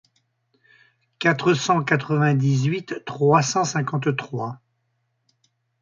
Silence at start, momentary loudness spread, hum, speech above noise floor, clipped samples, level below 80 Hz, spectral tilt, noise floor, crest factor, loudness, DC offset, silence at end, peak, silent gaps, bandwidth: 1.2 s; 12 LU; none; 51 dB; under 0.1%; -64 dBFS; -5.5 dB/octave; -72 dBFS; 20 dB; -21 LUFS; under 0.1%; 1.25 s; -4 dBFS; none; 7.6 kHz